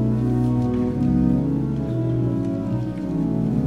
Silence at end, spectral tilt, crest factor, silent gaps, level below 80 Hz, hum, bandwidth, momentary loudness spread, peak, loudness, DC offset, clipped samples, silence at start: 0 s; -10.5 dB/octave; 12 dB; none; -36 dBFS; none; 7.2 kHz; 5 LU; -8 dBFS; -22 LUFS; under 0.1%; under 0.1%; 0 s